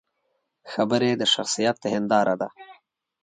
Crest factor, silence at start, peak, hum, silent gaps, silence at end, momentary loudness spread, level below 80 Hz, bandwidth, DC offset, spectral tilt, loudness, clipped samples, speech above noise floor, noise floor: 18 dB; 0.65 s; -6 dBFS; none; none; 0.5 s; 8 LU; -70 dBFS; 9.4 kHz; under 0.1%; -3.5 dB/octave; -23 LUFS; under 0.1%; 51 dB; -74 dBFS